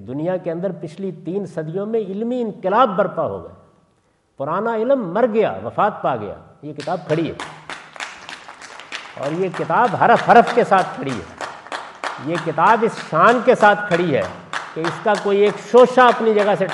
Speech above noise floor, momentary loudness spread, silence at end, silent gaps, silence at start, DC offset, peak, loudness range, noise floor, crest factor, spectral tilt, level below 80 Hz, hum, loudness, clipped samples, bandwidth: 44 dB; 18 LU; 0 s; none; 0 s; under 0.1%; 0 dBFS; 8 LU; -61 dBFS; 18 dB; -6 dB/octave; -64 dBFS; none; -18 LUFS; under 0.1%; 11.5 kHz